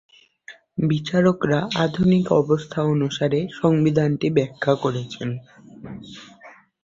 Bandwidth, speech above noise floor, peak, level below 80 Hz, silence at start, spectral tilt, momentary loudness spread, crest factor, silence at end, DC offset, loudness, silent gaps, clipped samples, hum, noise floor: 7.6 kHz; 27 dB; -4 dBFS; -54 dBFS; 0.5 s; -7 dB/octave; 19 LU; 18 dB; 0.35 s; under 0.1%; -21 LUFS; none; under 0.1%; none; -48 dBFS